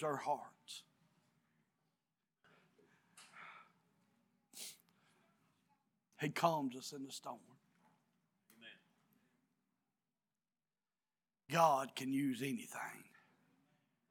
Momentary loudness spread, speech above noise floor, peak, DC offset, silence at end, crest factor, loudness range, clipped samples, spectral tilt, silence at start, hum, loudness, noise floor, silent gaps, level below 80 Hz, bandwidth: 25 LU; over 50 dB; -18 dBFS; under 0.1%; 1.1 s; 28 dB; 20 LU; under 0.1%; -4.5 dB/octave; 0 s; none; -40 LUFS; under -90 dBFS; none; under -90 dBFS; 17.5 kHz